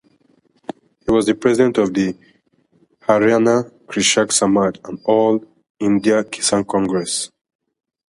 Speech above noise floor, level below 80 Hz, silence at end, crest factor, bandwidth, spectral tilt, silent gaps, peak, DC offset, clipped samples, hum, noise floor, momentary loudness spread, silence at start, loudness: 42 dB; -52 dBFS; 0.85 s; 18 dB; 11.5 kHz; -4 dB/octave; 5.70-5.75 s; 0 dBFS; under 0.1%; under 0.1%; none; -59 dBFS; 14 LU; 1.05 s; -17 LUFS